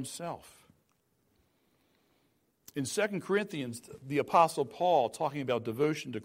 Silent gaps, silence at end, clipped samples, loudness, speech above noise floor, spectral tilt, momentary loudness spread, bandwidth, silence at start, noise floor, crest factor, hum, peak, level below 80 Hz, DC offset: none; 0 s; under 0.1%; -31 LUFS; 43 dB; -5 dB/octave; 15 LU; 16 kHz; 0 s; -74 dBFS; 22 dB; none; -12 dBFS; -74 dBFS; under 0.1%